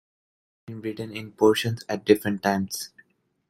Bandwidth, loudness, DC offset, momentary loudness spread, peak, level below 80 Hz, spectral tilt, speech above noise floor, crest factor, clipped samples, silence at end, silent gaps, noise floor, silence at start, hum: 16 kHz; -25 LUFS; under 0.1%; 14 LU; -2 dBFS; -64 dBFS; -5 dB/octave; 35 dB; 24 dB; under 0.1%; 0.65 s; none; -60 dBFS; 0.7 s; none